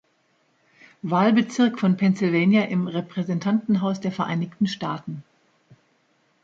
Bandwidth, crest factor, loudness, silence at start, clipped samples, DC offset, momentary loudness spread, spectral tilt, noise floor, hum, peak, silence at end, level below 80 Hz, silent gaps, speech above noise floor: 7.8 kHz; 16 dB; -22 LUFS; 1.05 s; under 0.1%; under 0.1%; 11 LU; -7 dB/octave; -66 dBFS; none; -6 dBFS; 1.2 s; -68 dBFS; none; 44 dB